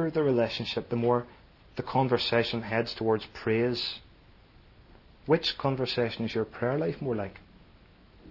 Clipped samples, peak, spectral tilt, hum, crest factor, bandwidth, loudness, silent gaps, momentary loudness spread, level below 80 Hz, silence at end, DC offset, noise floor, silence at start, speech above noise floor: under 0.1%; -10 dBFS; -7 dB/octave; none; 20 dB; 6 kHz; -29 LUFS; none; 9 LU; -58 dBFS; 0 s; under 0.1%; -56 dBFS; 0 s; 28 dB